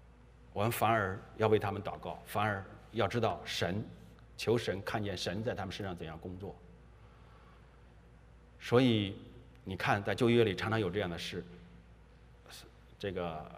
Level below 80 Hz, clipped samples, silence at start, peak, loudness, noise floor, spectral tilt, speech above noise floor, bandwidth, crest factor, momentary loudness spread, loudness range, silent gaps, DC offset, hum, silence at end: -60 dBFS; under 0.1%; 0.1 s; -14 dBFS; -34 LUFS; -58 dBFS; -6 dB/octave; 24 dB; 15.5 kHz; 22 dB; 21 LU; 8 LU; none; under 0.1%; none; 0 s